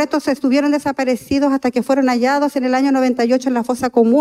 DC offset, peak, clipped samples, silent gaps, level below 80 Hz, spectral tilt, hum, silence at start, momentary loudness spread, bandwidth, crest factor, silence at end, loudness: under 0.1%; -2 dBFS; under 0.1%; none; -54 dBFS; -5 dB/octave; none; 0 s; 4 LU; 13.5 kHz; 12 dB; 0 s; -16 LUFS